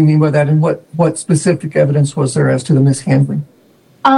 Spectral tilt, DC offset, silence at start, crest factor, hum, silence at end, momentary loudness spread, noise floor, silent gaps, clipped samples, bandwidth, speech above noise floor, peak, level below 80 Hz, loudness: -7 dB/octave; under 0.1%; 0 s; 12 dB; none; 0 s; 5 LU; -49 dBFS; none; under 0.1%; 11.5 kHz; 36 dB; 0 dBFS; -52 dBFS; -14 LUFS